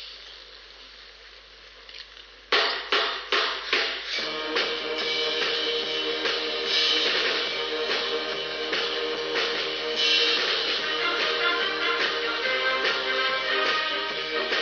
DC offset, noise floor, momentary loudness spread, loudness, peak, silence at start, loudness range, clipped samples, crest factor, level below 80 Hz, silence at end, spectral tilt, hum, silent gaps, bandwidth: under 0.1%; -48 dBFS; 20 LU; -24 LUFS; -8 dBFS; 0 s; 3 LU; under 0.1%; 18 dB; -60 dBFS; 0 s; -1 dB/octave; none; none; 7 kHz